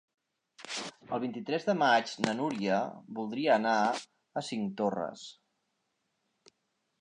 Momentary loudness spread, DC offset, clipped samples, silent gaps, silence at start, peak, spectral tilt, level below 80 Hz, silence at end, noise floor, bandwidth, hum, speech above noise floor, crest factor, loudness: 13 LU; under 0.1%; under 0.1%; none; 0.6 s; -10 dBFS; -4.5 dB/octave; -78 dBFS; 1.7 s; -80 dBFS; 11 kHz; none; 49 dB; 24 dB; -32 LUFS